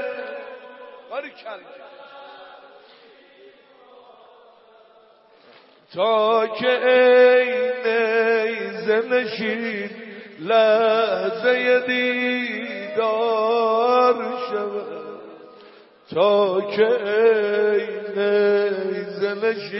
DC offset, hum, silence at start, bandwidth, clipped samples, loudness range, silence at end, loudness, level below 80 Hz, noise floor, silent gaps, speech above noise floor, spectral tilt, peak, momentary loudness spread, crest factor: under 0.1%; none; 0 s; 5.8 kHz; under 0.1%; 9 LU; 0 s; -20 LUFS; -80 dBFS; -53 dBFS; none; 34 dB; -8 dB/octave; -4 dBFS; 19 LU; 18 dB